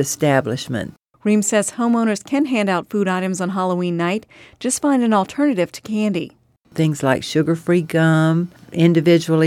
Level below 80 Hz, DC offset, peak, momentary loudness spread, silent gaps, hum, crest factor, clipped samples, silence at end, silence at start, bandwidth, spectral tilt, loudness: -60 dBFS; under 0.1%; -2 dBFS; 10 LU; none; none; 16 dB; under 0.1%; 0 s; 0 s; 15 kHz; -5.5 dB/octave; -19 LUFS